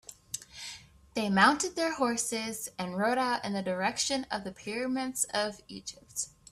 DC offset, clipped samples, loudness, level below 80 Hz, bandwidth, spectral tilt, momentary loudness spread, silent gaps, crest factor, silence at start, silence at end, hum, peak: under 0.1%; under 0.1%; -31 LUFS; -66 dBFS; 15.5 kHz; -3 dB/octave; 18 LU; none; 22 dB; 0.1 s; 0.25 s; none; -8 dBFS